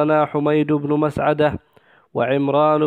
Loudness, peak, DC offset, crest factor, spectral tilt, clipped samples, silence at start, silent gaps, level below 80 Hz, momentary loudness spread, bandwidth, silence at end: -19 LUFS; -4 dBFS; under 0.1%; 14 dB; -8.5 dB/octave; under 0.1%; 0 s; none; -52 dBFS; 6 LU; 9.4 kHz; 0 s